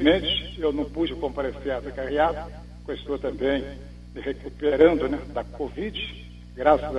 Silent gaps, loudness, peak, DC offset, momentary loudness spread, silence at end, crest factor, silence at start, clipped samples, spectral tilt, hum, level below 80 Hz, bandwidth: none; -26 LUFS; -4 dBFS; under 0.1%; 18 LU; 0 s; 20 dB; 0 s; under 0.1%; -6.5 dB/octave; 60 Hz at -40 dBFS; -40 dBFS; 9.6 kHz